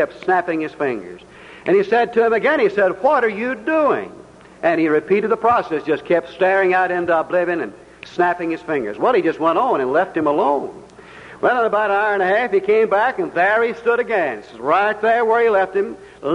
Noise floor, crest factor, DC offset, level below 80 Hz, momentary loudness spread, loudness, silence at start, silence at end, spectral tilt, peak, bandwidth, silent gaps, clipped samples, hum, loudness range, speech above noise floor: -40 dBFS; 12 dB; under 0.1%; -58 dBFS; 8 LU; -18 LUFS; 0 s; 0 s; -6.5 dB/octave; -6 dBFS; 10.5 kHz; none; under 0.1%; none; 2 LU; 23 dB